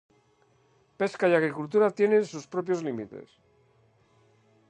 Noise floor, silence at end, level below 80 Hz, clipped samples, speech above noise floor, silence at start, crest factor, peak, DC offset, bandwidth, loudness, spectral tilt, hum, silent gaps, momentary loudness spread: -65 dBFS; 1.45 s; -76 dBFS; under 0.1%; 39 dB; 1 s; 20 dB; -8 dBFS; under 0.1%; 9.4 kHz; -26 LUFS; -6.5 dB/octave; none; none; 13 LU